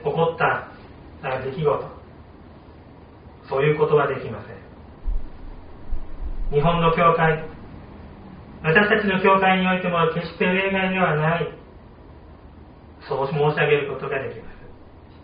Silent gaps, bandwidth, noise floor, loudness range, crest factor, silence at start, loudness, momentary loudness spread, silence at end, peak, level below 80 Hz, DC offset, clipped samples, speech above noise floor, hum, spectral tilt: none; 5 kHz; -45 dBFS; 6 LU; 22 dB; 0 s; -21 LUFS; 24 LU; 0.05 s; -2 dBFS; -36 dBFS; under 0.1%; under 0.1%; 25 dB; none; -4.5 dB/octave